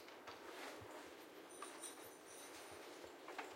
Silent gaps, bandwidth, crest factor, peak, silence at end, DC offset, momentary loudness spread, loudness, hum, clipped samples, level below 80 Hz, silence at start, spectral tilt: none; 16.5 kHz; 20 dB; -36 dBFS; 0 s; under 0.1%; 4 LU; -54 LUFS; none; under 0.1%; -88 dBFS; 0 s; -2 dB/octave